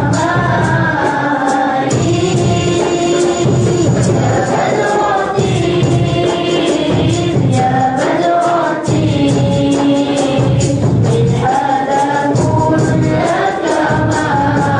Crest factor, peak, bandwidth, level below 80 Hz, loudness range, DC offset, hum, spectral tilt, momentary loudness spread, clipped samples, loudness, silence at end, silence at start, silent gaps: 10 dB; -4 dBFS; 10.5 kHz; -36 dBFS; 0 LU; under 0.1%; none; -6 dB/octave; 2 LU; under 0.1%; -13 LUFS; 0 s; 0 s; none